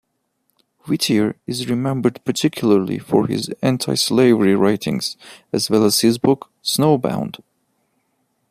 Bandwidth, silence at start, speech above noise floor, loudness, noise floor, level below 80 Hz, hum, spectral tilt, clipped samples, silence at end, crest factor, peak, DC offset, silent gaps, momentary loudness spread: 15.5 kHz; 0.85 s; 52 dB; -18 LUFS; -70 dBFS; -58 dBFS; none; -5 dB/octave; under 0.1%; 1.15 s; 16 dB; -2 dBFS; under 0.1%; none; 11 LU